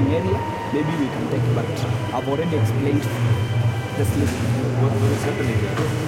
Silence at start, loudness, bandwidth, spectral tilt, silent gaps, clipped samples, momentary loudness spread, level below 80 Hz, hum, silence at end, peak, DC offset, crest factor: 0 s; -22 LUFS; 16 kHz; -7 dB/octave; none; under 0.1%; 3 LU; -46 dBFS; none; 0 s; -8 dBFS; under 0.1%; 12 dB